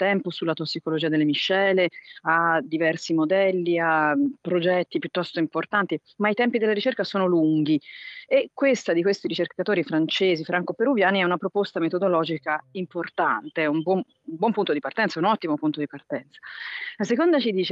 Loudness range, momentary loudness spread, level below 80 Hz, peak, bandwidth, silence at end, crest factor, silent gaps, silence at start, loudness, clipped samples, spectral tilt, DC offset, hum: 3 LU; 9 LU; -78 dBFS; -6 dBFS; 7.8 kHz; 0 s; 18 dB; none; 0 s; -24 LUFS; under 0.1%; -6 dB/octave; under 0.1%; none